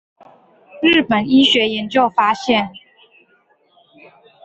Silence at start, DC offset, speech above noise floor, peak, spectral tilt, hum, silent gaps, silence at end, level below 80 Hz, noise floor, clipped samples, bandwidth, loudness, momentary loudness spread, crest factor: 0.75 s; under 0.1%; 43 dB; -2 dBFS; -4.5 dB/octave; none; none; 1.65 s; -56 dBFS; -58 dBFS; under 0.1%; 8.2 kHz; -15 LUFS; 6 LU; 16 dB